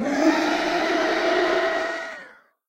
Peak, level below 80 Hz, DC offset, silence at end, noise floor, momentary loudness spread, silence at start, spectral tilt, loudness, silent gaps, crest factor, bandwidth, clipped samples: -8 dBFS; -56 dBFS; under 0.1%; 0.35 s; -47 dBFS; 11 LU; 0 s; -3 dB/octave; -22 LUFS; none; 16 dB; 16 kHz; under 0.1%